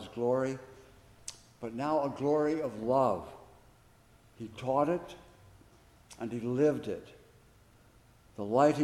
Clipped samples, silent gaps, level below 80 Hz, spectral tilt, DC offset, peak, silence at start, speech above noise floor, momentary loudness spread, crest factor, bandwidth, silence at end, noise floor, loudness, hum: under 0.1%; none; -66 dBFS; -6.5 dB/octave; under 0.1%; -12 dBFS; 0 s; 31 dB; 18 LU; 22 dB; 14.5 kHz; 0 s; -61 dBFS; -32 LUFS; none